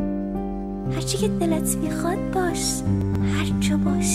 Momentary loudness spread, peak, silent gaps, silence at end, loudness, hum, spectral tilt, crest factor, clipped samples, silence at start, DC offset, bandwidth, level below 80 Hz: 6 LU; -8 dBFS; none; 0 s; -24 LUFS; none; -5 dB/octave; 14 dB; under 0.1%; 0 s; under 0.1%; 16 kHz; -36 dBFS